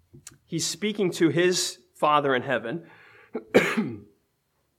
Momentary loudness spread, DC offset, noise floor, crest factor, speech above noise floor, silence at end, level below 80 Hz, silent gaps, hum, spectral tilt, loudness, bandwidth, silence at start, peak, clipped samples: 15 LU; under 0.1%; -73 dBFS; 22 dB; 48 dB; 0.8 s; -70 dBFS; none; none; -4 dB/octave; -25 LUFS; 16 kHz; 0.25 s; -4 dBFS; under 0.1%